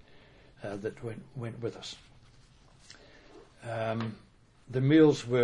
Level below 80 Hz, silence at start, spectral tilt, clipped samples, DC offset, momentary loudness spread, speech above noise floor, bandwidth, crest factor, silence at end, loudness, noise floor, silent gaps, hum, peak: -62 dBFS; 0.6 s; -7 dB/octave; under 0.1%; under 0.1%; 22 LU; 30 dB; 10.5 kHz; 20 dB; 0 s; -30 LUFS; -58 dBFS; none; none; -12 dBFS